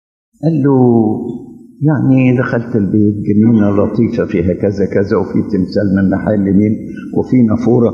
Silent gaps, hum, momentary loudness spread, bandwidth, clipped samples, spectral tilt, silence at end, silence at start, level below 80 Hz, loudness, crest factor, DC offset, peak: none; none; 7 LU; 6.8 kHz; under 0.1%; -10 dB/octave; 0 s; 0.4 s; -46 dBFS; -13 LUFS; 12 dB; under 0.1%; 0 dBFS